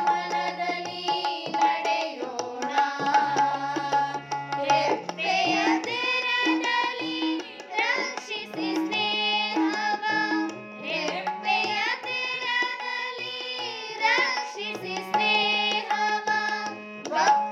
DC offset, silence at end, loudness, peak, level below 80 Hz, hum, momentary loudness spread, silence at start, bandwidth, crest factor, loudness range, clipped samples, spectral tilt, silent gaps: under 0.1%; 0 s; -26 LUFS; -8 dBFS; -86 dBFS; none; 9 LU; 0 s; 14 kHz; 18 dB; 2 LU; under 0.1%; -2.5 dB/octave; none